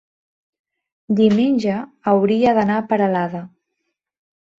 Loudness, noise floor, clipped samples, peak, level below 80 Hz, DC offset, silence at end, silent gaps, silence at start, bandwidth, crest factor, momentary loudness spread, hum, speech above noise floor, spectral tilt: -18 LUFS; -76 dBFS; under 0.1%; -4 dBFS; -60 dBFS; under 0.1%; 1.1 s; none; 1.1 s; 7.4 kHz; 16 dB; 9 LU; none; 59 dB; -8 dB/octave